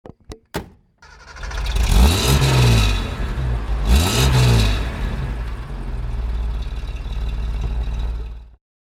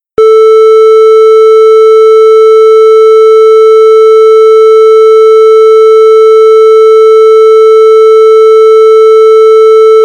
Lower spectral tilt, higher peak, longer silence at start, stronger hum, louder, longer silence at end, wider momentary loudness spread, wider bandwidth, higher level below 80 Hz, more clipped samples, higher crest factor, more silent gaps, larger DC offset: first, -5 dB/octave vs -2 dB/octave; about the same, 0 dBFS vs 0 dBFS; second, 0.05 s vs 0.2 s; neither; second, -20 LUFS vs -2 LUFS; first, 0.5 s vs 0 s; first, 17 LU vs 0 LU; first, 16 kHz vs 8.8 kHz; first, -22 dBFS vs -54 dBFS; second, under 0.1% vs 30%; first, 18 dB vs 2 dB; neither; neither